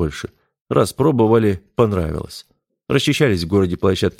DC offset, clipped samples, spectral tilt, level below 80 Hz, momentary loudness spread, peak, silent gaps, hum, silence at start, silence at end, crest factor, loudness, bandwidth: under 0.1%; under 0.1%; -6 dB/octave; -40 dBFS; 16 LU; -2 dBFS; 0.61-0.66 s; none; 0 s; 0.1 s; 16 dB; -18 LUFS; 16.5 kHz